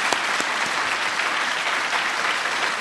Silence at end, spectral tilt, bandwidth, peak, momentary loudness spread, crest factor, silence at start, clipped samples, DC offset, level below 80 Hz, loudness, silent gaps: 0 s; 0 dB/octave; 12.5 kHz; -2 dBFS; 1 LU; 22 dB; 0 s; under 0.1%; under 0.1%; -64 dBFS; -22 LUFS; none